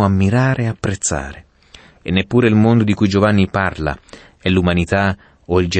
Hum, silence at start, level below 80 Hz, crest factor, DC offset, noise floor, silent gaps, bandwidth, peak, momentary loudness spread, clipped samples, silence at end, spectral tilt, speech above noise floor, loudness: none; 0 s; -38 dBFS; 14 dB; under 0.1%; -45 dBFS; none; 8.8 kHz; -2 dBFS; 11 LU; under 0.1%; 0 s; -6 dB/octave; 30 dB; -16 LUFS